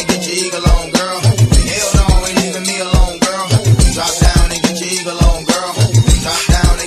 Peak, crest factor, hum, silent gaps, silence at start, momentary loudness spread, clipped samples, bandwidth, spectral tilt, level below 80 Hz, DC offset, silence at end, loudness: 0 dBFS; 12 dB; none; none; 0 s; 4 LU; under 0.1%; 14 kHz; -4.5 dB/octave; -16 dBFS; under 0.1%; 0 s; -13 LUFS